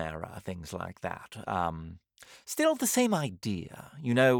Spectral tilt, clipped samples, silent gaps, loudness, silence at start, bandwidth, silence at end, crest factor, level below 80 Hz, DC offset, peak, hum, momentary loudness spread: -4.5 dB/octave; under 0.1%; none; -31 LUFS; 0 s; over 20 kHz; 0 s; 20 dB; -62 dBFS; under 0.1%; -10 dBFS; none; 18 LU